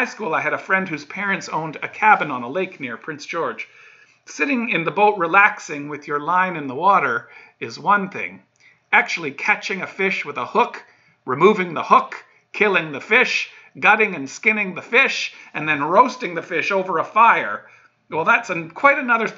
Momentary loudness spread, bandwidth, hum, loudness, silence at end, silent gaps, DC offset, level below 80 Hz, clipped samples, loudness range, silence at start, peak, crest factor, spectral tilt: 14 LU; 7.8 kHz; none; -19 LUFS; 0 s; none; under 0.1%; -74 dBFS; under 0.1%; 4 LU; 0 s; 0 dBFS; 20 dB; -4.5 dB/octave